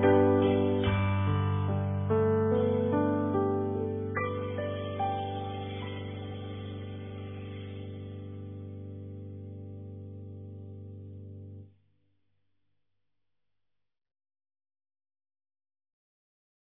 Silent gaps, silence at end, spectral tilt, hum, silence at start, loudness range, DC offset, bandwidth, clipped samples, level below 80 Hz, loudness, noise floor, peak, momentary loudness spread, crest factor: none; 5.1 s; -11.5 dB/octave; 50 Hz at -75 dBFS; 0 s; 20 LU; under 0.1%; 3.8 kHz; under 0.1%; -58 dBFS; -30 LUFS; -89 dBFS; -14 dBFS; 19 LU; 18 dB